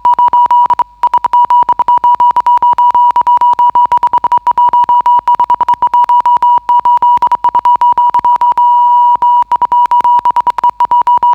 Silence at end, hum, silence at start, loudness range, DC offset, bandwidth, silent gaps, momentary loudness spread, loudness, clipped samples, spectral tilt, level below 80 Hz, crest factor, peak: 0 s; none; 0.05 s; 0 LU; under 0.1%; 5.8 kHz; none; 3 LU; -8 LUFS; under 0.1%; -3.5 dB/octave; -50 dBFS; 8 dB; -2 dBFS